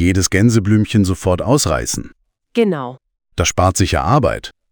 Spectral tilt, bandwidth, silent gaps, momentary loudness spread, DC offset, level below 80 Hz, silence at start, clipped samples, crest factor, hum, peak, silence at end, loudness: -5 dB/octave; over 20 kHz; none; 11 LU; under 0.1%; -32 dBFS; 0 s; under 0.1%; 14 dB; none; -2 dBFS; 0.2 s; -16 LUFS